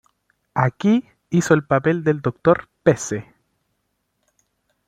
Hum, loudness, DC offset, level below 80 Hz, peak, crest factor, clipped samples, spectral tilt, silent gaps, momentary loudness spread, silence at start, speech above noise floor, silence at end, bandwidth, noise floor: none; -20 LUFS; under 0.1%; -56 dBFS; -2 dBFS; 20 dB; under 0.1%; -6.5 dB/octave; none; 7 LU; 0.55 s; 54 dB; 1.65 s; 14.5 kHz; -72 dBFS